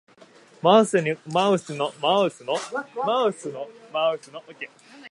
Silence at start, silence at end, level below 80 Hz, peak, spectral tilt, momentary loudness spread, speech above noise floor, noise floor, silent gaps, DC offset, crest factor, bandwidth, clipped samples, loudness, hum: 0.65 s; 0 s; -78 dBFS; -2 dBFS; -4.5 dB/octave; 19 LU; 28 dB; -52 dBFS; none; under 0.1%; 22 dB; 11.5 kHz; under 0.1%; -23 LUFS; none